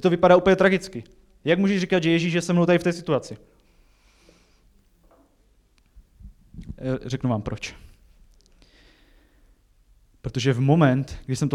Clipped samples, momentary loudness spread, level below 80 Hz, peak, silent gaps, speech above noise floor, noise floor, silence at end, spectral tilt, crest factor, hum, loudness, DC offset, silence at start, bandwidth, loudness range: under 0.1%; 20 LU; -50 dBFS; -4 dBFS; none; 40 dB; -61 dBFS; 0 s; -6.5 dB/octave; 20 dB; none; -22 LUFS; under 0.1%; 0.05 s; 12 kHz; 13 LU